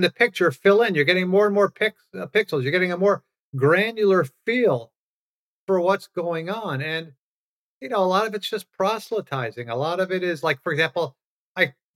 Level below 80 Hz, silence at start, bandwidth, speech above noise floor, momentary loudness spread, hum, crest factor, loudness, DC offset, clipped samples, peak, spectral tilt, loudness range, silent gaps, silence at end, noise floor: -80 dBFS; 0 s; 16.5 kHz; over 68 dB; 10 LU; none; 20 dB; -22 LUFS; under 0.1%; under 0.1%; -4 dBFS; -6 dB/octave; 6 LU; 3.39-3.53 s, 4.96-5.67 s, 7.19-7.81 s, 11.24-11.55 s; 0.25 s; under -90 dBFS